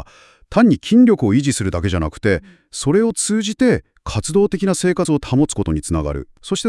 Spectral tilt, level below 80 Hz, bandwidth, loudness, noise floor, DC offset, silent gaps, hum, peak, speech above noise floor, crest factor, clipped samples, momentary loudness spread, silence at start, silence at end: -5.5 dB/octave; -38 dBFS; 12 kHz; -17 LUFS; -43 dBFS; under 0.1%; none; none; 0 dBFS; 26 dB; 16 dB; under 0.1%; 11 LU; 0 s; 0 s